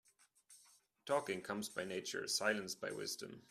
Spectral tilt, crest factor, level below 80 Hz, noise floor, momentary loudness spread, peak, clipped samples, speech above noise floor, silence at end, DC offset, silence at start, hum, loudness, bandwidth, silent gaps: -2.5 dB/octave; 22 dB; -84 dBFS; -70 dBFS; 8 LU; -22 dBFS; under 0.1%; 28 dB; 0.1 s; under 0.1%; 0.5 s; none; -41 LUFS; 15.5 kHz; none